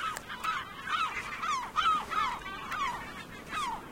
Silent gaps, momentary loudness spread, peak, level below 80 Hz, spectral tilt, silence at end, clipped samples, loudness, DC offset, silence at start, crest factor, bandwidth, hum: none; 10 LU; -16 dBFS; -58 dBFS; -2 dB/octave; 0 s; under 0.1%; -33 LUFS; under 0.1%; 0 s; 18 dB; 16.5 kHz; none